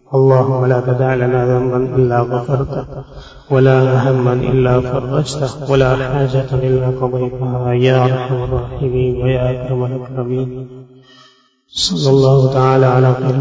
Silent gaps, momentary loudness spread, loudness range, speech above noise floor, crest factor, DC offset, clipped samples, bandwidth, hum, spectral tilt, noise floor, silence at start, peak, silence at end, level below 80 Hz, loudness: none; 10 LU; 4 LU; 37 dB; 14 dB; under 0.1%; under 0.1%; 8 kHz; none; -7 dB/octave; -50 dBFS; 0.1 s; 0 dBFS; 0 s; -36 dBFS; -14 LUFS